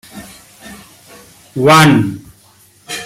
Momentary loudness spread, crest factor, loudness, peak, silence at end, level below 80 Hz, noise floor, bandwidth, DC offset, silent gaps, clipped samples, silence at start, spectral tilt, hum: 27 LU; 16 dB; -10 LUFS; 0 dBFS; 0 s; -50 dBFS; -47 dBFS; 16 kHz; under 0.1%; none; under 0.1%; 0.15 s; -5 dB/octave; none